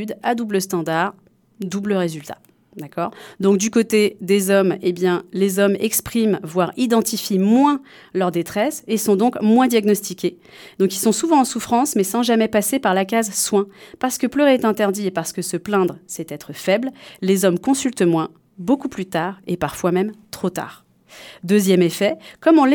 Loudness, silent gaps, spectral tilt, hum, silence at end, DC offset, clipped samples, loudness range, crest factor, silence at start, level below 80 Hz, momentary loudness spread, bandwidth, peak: -19 LUFS; none; -5 dB/octave; none; 0 s; under 0.1%; under 0.1%; 4 LU; 16 dB; 0 s; -58 dBFS; 11 LU; 19 kHz; -2 dBFS